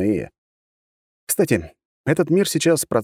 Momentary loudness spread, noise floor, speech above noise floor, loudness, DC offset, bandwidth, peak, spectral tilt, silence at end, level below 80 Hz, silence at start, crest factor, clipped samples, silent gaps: 9 LU; under -90 dBFS; over 71 dB; -20 LUFS; under 0.1%; 17 kHz; -4 dBFS; -5 dB/octave; 0 s; -52 dBFS; 0 s; 18 dB; under 0.1%; 0.38-1.27 s, 1.85-2.04 s